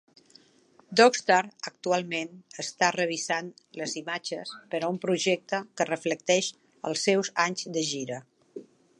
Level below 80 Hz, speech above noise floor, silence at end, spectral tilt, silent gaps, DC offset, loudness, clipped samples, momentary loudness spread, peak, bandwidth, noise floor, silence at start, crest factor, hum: -80 dBFS; 33 dB; 0.35 s; -3 dB/octave; none; under 0.1%; -27 LUFS; under 0.1%; 14 LU; -6 dBFS; 11.5 kHz; -61 dBFS; 0.9 s; 24 dB; none